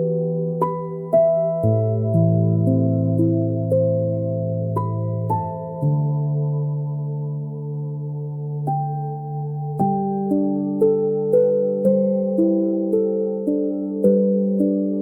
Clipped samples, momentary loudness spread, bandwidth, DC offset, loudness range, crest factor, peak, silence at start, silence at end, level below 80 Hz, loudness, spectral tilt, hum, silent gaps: under 0.1%; 10 LU; 2.1 kHz; under 0.1%; 6 LU; 14 dB; -6 dBFS; 0 s; 0 s; -60 dBFS; -21 LUFS; -13.5 dB/octave; none; none